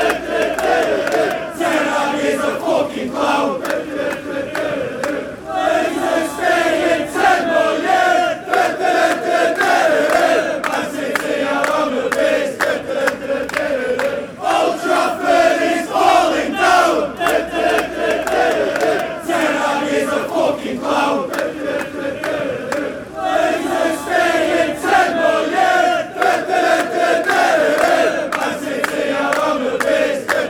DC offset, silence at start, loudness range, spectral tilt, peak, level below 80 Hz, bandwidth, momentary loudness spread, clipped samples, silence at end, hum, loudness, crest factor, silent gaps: under 0.1%; 0 s; 4 LU; -3.5 dB/octave; -2 dBFS; -50 dBFS; 19.5 kHz; 8 LU; under 0.1%; 0 s; none; -17 LUFS; 14 dB; none